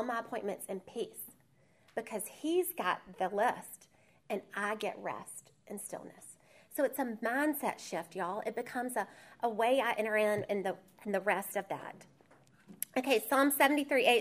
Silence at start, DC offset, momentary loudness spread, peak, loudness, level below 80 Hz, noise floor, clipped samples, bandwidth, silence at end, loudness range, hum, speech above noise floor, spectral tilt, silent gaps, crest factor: 0 s; under 0.1%; 16 LU; -12 dBFS; -34 LUFS; -80 dBFS; -68 dBFS; under 0.1%; 15.5 kHz; 0 s; 5 LU; none; 34 dB; -3.5 dB/octave; none; 22 dB